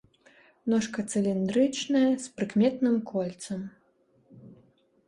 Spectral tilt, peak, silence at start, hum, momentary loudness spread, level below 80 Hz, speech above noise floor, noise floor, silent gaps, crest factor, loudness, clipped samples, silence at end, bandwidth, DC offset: -5.5 dB/octave; -12 dBFS; 0.65 s; none; 12 LU; -68 dBFS; 40 dB; -66 dBFS; none; 16 dB; -28 LUFS; under 0.1%; 0.55 s; 11.5 kHz; under 0.1%